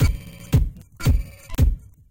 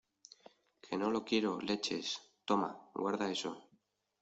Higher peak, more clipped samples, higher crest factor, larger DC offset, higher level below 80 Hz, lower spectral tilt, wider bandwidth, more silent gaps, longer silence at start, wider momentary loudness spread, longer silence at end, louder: first, -6 dBFS vs -18 dBFS; neither; about the same, 16 dB vs 20 dB; neither; first, -24 dBFS vs -78 dBFS; first, -6.5 dB/octave vs -4 dB/octave; first, 17 kHz vs 8.2 kHz; neither; second, 0 s vs 0.85 s; about the same, 10 LU vs 10 LU; second, 0.3 s vs 0.6 s; first, -24 LUFS vs -37 LUFS